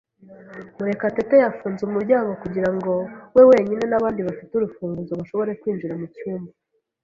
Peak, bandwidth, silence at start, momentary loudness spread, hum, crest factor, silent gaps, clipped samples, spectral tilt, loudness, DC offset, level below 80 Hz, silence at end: -2 dBFS; 7 kHz; 0.3 s; 17 LU; none; 20 dB; none; under 0.1%; -8.5 dB/octave; -21 LUFS; under 0.1%; -58 dBFS; 0.55 s